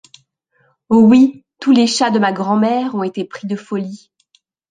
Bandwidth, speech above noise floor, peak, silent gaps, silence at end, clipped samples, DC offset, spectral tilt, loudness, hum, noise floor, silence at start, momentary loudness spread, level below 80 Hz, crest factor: 9.6 kHz; 46 dB; -2 dBFS; none; 0.75 s; under 0.1%; under 0.1%; -5.5 dB/octave; -15 LUFS; none; -60 dBFS; 0.9 s; 14 LU; -60 dBFS; 14 dB